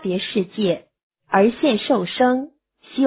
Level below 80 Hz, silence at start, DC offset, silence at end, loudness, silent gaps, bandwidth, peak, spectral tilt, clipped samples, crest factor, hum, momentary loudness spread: -62 dBFS; 0 s; under 0.1%; 0 s; -20 LUFS; 1.03-1.10 s; 4 kHz; -4 dBFS; -10 dB/octave; under 0.1%; 18 dB; none; 10 LU